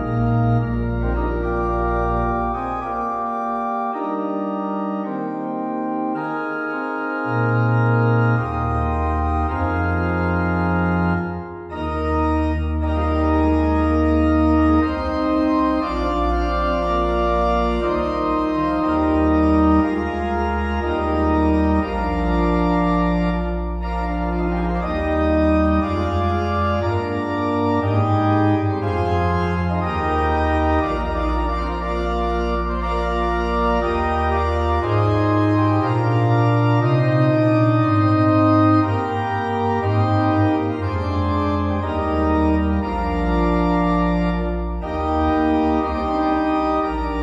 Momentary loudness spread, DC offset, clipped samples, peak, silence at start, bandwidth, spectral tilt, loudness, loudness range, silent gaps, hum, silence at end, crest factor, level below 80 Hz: 7 LU; under 0.1%; under 0.1%; -4 dBFS; 0 s; 8 kHz; -9 dB/octave; -20 LUFS; 5 LU; none; none; 0 s; 14 dB; -28 dBFS